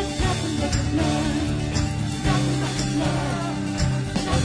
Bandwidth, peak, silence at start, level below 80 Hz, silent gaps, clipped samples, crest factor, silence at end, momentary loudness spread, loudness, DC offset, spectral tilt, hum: 10.5 kHz; -8 dBFS; 0 s; -34 dBFS; none; under 0.1%; 14 dB; 0 s; 3 LU; -24 LUFS; under 0.1%; -5.5 dB/octave; none